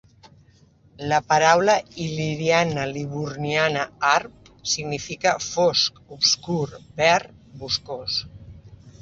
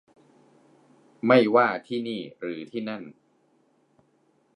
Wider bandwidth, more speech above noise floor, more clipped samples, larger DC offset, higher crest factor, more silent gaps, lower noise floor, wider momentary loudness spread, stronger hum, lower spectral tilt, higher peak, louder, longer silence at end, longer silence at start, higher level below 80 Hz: second, 8 kHz vs 10 kHz; second, 33 dB vs 42 dB; neither; neither; about the same, 22 dB vs 24 dB; neither; second, -55 dBFS vs -66 dBFS; second, 11 LU vs 17 LU; neither; second, -3 dB/octave vs -7 dB/octave; about the same, -2 dBFS vs -4 dBFS; first, -22 LUFS vs -25 LUFS; second, 0.1 s vs 1.45 s; second, 1 s vs 1.25 s; first, -54 dBFS vs -78 dBFS